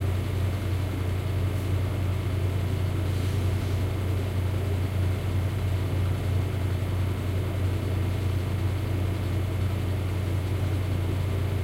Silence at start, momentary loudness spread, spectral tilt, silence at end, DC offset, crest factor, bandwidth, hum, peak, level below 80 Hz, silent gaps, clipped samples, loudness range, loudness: 0 s; 1 LU; -7 dB/octave; 0 s; under 0.1%; 10 dB; 16 kHz; none; -16 dBFS; -40 dBFS; none; under 0.1%; 0 LU; -28 LUFS